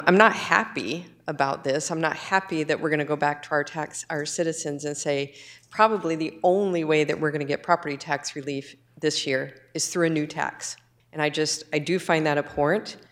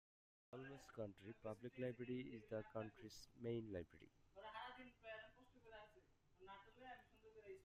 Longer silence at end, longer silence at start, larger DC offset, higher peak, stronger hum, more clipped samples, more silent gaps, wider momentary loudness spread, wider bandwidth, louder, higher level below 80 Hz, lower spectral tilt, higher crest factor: first, 0.15 s vs 0 s; second, 0 s vs 0.5 s; neither; first, 0 dBFS vs -36 dBFS; neither; neither; neither; second, 10 LU vs 15 LU; first, 15.5 kHz vs 14 kHz; first, -25 LUFS vs -55 LUFS; first, -66 dBFS vs -78 dBFS; second, -4 dB/octave vs -6.5 dB/octave; about the same, 24 dB vs 20 dB